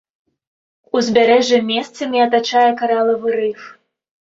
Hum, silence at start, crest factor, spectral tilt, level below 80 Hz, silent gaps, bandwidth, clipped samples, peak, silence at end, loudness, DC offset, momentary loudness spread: none; 0.95 s; 16 dB; -4 dB/octave; -62 dBFS; none; 7.8 kHz; under 0.1%; -2 dBFS; 0.6 s; -16 LUFS; under 0.1%; 9 LU